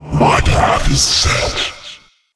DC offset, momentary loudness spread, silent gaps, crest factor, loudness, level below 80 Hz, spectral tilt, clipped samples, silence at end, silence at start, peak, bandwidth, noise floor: under 0.1%; 12 LU; none; 14 dB; -13 LUFS; -22 dBFS; -3.5 dB/octave; under 0.1%; 0.4 s; 0 s; 0 dBFS; 11 kHz; -38 dBFS